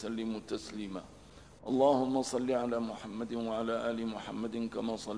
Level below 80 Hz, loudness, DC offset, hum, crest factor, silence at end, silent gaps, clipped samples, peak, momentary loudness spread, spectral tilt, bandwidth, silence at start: -64 dBFS; -34 LUFS; under 0.1%; 50 Hz at -60 dBFS; 18 dB; 0 s; none; under 0.1%; -16 dBFS; 13 LU; -5.5 dB/octave; 11 kHz; 0 s